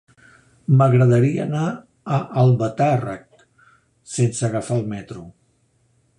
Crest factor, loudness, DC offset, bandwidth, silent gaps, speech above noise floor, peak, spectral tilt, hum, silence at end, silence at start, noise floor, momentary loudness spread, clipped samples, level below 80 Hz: 16 dB; -19 LUFS; under 0.1%; 11 kHz; none; 44 dB; -4 dBFS; -7.5 dB/octave; none; 0.9 s; 0.7 s; -63 dBFS; 18 LU; under 0.1%; -56 dBFS